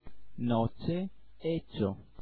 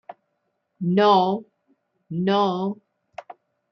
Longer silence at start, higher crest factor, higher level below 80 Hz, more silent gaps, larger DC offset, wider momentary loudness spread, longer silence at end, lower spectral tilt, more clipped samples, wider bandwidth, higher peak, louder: about the same, 0 s vs 0.1 s; about the same, 16 dB vs 18 dB; first, -56 dBFS vs -72 dBFS; neither; neither; second, 9 LU vs 25 LU; second, 0 s vs 0.4 s; first, -11 dB/octave vs -7.5 dB/octave; neither; second, 4.7 kHz vs 6.2 kHz; second, -16 dBFS vs -6 dBFS; second, -34 LUFS vs -22 LUFS